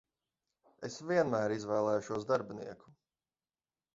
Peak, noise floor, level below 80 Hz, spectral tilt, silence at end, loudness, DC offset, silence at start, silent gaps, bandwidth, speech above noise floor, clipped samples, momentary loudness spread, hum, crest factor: -18 dBFS; under -90 dBFS; -74 dBFS; -5.5 dB/octave; 1.05 s; -34 LUFS; under 0.1%; 0.8 s; none; 7.6 kHz; over 56 dB; under 0.1%; 15 LU; none; 20 dB